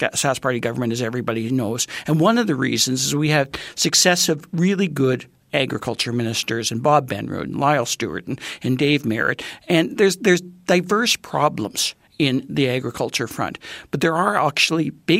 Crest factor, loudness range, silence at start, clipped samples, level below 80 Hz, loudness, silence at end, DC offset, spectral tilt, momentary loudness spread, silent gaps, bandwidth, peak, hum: 18 dB; 3 LU; 0 s; under 0.1%; -58 dBFS; -20 LUFS; 0 s; under 0.1%; -4 dB/octave; 8 LU; none; 16 kHz; -2 dBFS; none